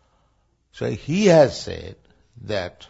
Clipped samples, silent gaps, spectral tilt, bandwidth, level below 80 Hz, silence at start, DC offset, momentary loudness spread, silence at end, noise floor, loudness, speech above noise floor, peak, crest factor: under 0.1%; none; -6 dB/octave; 8 kHz; -50 dBFS; 0.75 s; under 0.1%; 19 LU; 0.2 s; -65 dBFS; -20 LUFS; 45 dB; -2 dBFS; 20 dB